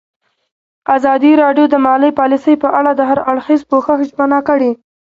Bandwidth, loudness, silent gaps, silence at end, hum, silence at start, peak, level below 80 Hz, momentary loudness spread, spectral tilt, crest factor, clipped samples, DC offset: 7.2 kHz; -12 LUFS; none; 0.35 s; none; 0.9 s; 0 dBFS; -56 dBFS; 6 LU; -6.5 dB/octave; 12 dB; under 0.1%; under 0.1%